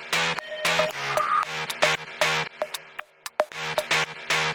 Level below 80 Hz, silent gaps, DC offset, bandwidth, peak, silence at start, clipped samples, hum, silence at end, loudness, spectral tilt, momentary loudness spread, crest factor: -62 dBFS; none; under 0.1%; 19.5 kHz; -8 dBFS; 0 s; under 0.1%; none; 0 s; -25 LUFS; -1.5 dB/octave; 9 LU; 20 dB